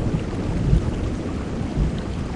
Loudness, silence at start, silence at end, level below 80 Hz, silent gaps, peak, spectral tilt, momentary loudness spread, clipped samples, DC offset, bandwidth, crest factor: -25 LUFS; 0 s; 0 s; -28 dBFS; none; -4 dBFS; -7.5 dB/octave; 6 LU; under 0.1%; under 0.1%; 10.5 kHz; 20 dB